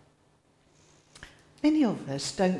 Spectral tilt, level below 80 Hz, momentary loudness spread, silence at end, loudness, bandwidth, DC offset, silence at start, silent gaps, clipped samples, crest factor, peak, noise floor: -5.5 dB/octave; -62 dBFS; 25 LU; 0 s; -28 LUFS; 12 kHz; under 0.1%; 1.2 s; none; under 0.1%; 18 dB; -12 dBFS; -65 dBFS